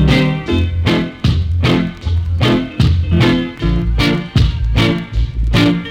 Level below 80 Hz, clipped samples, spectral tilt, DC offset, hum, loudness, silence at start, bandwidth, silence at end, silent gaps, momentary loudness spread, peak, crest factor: -20 dBFS; under 0.1%; -7 dB/octave; under 0.1%; none; -15 LUFS; 0 s; 13 kHz; 0 s; none; 5 LU; -2 dBFS; 10 dB